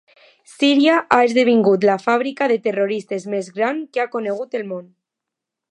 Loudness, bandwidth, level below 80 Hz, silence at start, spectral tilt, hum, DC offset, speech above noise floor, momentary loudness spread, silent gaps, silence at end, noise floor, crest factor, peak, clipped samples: -18 LUFS; 11 kHz; -72 dBFS; 0.6 s; -5.5 dB/octave; none; under 0.1%; 66 dB; 11 LU; none; 0.9 s; -84 dBFS; 18 dB; 0 dBFS; under 0.1%